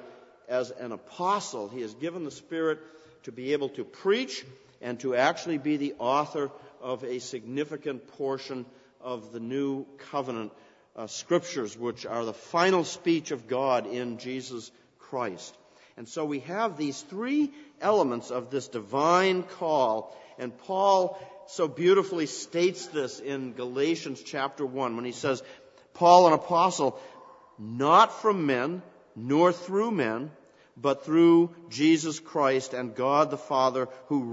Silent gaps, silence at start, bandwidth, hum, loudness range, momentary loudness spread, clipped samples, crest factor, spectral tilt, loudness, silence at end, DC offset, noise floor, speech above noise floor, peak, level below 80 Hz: none; 0 s; 8 kHz; none; 9 LU; 15 LU; under 0.1%; 24 dB; -5 dB/octave; -27 LUFS; 0 s; under 0.1%; -50 dBFS; 23 dB; -4 dBFS; -78 dBFS